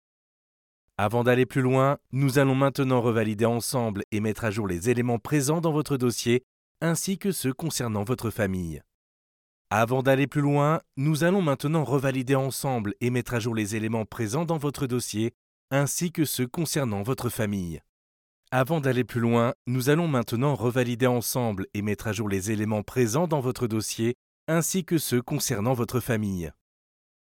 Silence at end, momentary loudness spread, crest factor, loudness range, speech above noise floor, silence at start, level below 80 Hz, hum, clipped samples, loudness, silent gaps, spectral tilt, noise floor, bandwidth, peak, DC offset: 0.8 s; 6 LU; 18 dB; 4 LU; over 65 dB; 1 s; -56 dBFS; none; under 0.1%; -26 LUFS; 4.04-4.12 s, 6.43-6.75 s, 8.94-9.65 s, 15.34-15.68 s, 17.89-18.43 s, 19.55-19.65 s, 24.15-24.47 s; -5.5 dB/octave; under -90 dBFS; 18.5 kHz; -8 dBFS; under 0.1%